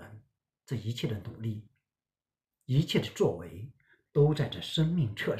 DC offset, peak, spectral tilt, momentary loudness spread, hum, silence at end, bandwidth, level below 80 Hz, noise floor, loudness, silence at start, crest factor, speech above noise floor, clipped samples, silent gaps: under 0.1%; -12 dBFS; -6.5 dB/octave; 17 LU; none; 0 s; 14.5 kHz; -58 dBFS; under -90 dBFS; -31 LUFS; 0 s; 20 dB; over 60 dB; under 0.1%; none